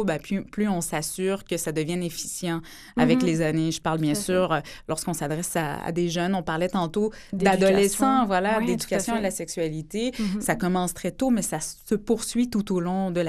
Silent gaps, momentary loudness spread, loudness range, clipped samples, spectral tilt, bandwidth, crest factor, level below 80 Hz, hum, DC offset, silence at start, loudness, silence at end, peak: none; 8 LU; 3 LU; under 0.1%; -5 dB/octave; 15 kHz; 18 dB; -48 dBFS; none; under 0.1%; 0 s; -25 LUFS; 0 s; -6 dBFS